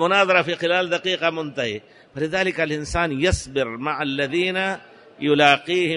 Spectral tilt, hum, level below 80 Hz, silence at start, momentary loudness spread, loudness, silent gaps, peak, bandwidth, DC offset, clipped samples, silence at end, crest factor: -4.5 dB/octave; none; -42 dBFS; 0 s; 11 LU; -21 LUFS; none; -2 dBFS; 11 kHz; under 0.1%; under 0.1%; 0 s; 20 dB